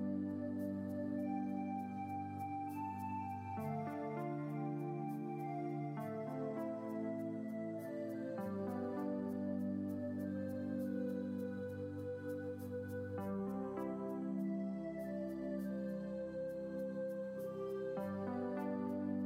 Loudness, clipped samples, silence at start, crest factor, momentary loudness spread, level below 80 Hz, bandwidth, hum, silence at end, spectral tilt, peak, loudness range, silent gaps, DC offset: -43 LUFS; under 0.1%; 0 s; 12 dB; 4 LU; -76 dBFS; 16 kHz; none; 0 s; -9 dB/octave; -30 dBFS; 1 LU; none; under 0.1%